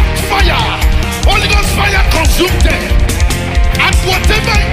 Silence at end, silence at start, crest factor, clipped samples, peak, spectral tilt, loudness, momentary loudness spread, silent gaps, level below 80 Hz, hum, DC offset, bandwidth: 0 s; 0 s; 10 dB; under 0.1%; 0 dBFS; -4 dB/octave; -11 LUFS; 4 LU; none; -12 dBFS; none; under 0.1%; 16 kHz